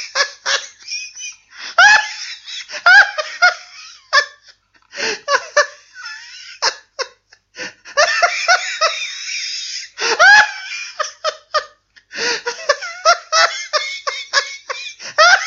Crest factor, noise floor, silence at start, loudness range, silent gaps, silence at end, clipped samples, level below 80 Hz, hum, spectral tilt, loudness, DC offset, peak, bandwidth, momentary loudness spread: 18 dB; -50 dBFS; 0 s; 6 LU; none; 0 s; under 0.1%; -64 dBFS; none; 2 dB/octave; -15 LUFS; under 0.1%; 0 dBFS; 8 kHz; 21 LU